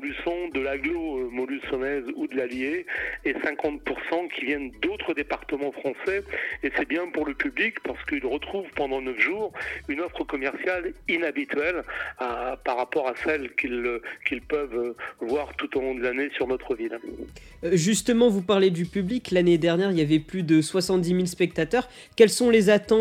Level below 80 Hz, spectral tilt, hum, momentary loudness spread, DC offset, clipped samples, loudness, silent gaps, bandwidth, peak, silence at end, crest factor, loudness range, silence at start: -52 dBFS; -5 dB/octave; none; 10 LU; under 0.1%; under 0.1%; -26 LUFS; none; 16 kHz; -4 dBFS; 0 s; 22 dB; 6 LU; 0 s